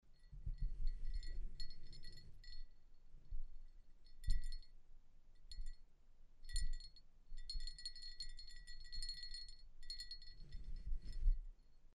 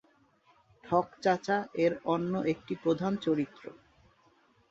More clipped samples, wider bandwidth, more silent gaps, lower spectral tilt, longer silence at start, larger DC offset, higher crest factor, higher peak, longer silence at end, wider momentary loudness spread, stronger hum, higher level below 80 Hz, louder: neither; first, 9.8 kHz vs 7.8 kHz; neither; second, -2.5 dB/octave vs -7 dB/octave; second, 0.05 s vs 0.85 s; neither; about the same, 20 dB vs 20 dB; second, -24 dBFS vs -12 dBFS; second, 0.05 s vs 1 s; first, 15 LU vs 5 LU; neither; first, -46 dBFS vs -70 dBFS; second, -52 LUFS vs -31 LUFS